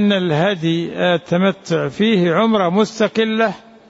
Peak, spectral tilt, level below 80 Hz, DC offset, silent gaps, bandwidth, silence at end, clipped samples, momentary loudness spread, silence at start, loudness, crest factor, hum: -4 dBFS; -6 dB/octave; -58 dBFS; under 0.1%; none; 8 kHz; 0.3 s; under 0.1%; 5 LU; 0 s; -17 LUFS; 12 dB; none